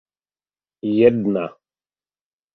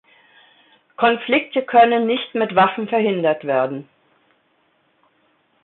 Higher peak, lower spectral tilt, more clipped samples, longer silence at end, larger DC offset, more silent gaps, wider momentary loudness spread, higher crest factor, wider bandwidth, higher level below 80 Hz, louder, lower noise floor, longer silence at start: about the same, -2 dBFS vs -2 dBFS; about the same, -10 dB/octave vs -10 dB/octave; neither; second, 1.05 s vs 1.8 s; neither; neither; first, 14 LU vs 7 LU; about the same, 20 dB vs 18 dB; about the same, 4.5 kHz vs 4.2 kHz; first, -60 dBFS vs -66 dBFS; about the same, -18 LUFS vs -18 LUFS; first, under -90 dBFS vs -63 dBFS; second, 0.85 s vs 1 s